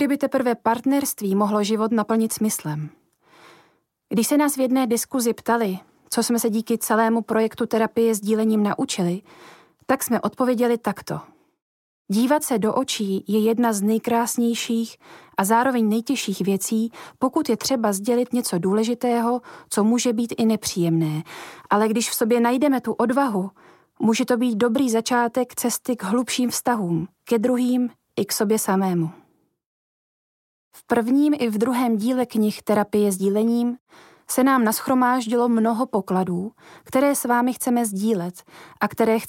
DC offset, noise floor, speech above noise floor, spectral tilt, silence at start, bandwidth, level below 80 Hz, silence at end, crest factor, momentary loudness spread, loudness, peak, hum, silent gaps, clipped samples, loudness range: under 0.1%; -63 dBFS; 42 dB; -5 dB/octave; 0 s; 17 kHz; -68 dBFS; 0 s; 16 dB; 7 LU; -22 LUFS; -6 dBFS; none; 11.62-12.05 s, 29.66-30.71 s, 33.80-33.86 s; under 0.1%; 3 LU